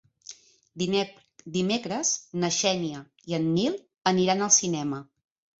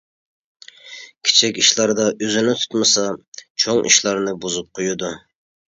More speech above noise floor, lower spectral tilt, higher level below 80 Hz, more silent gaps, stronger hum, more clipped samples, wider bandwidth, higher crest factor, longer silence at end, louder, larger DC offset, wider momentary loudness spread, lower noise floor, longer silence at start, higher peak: about the same, 23 dB vs 21 dB; first, -3.5 dB/octave vs -1.5 dB/octave; second, -66 dBFS vs -60 dBFS; second, none vs 3.28-3.32 s, 3.50-3.55 s; neither; neither; second, 8 kHz vs 11 kHz; about the same, 22 dB vs 20 dB; about the same, 0.55 s vs 0.5 s; second, -26 LUFS vs -17 LUFS; neither; about the same, 16 LU vs 18 LU; first, -49 dBFS vs -40 dBFS; second, 0.3 s vs 0.85 s; second, -6 dBFS vs 0 dBFS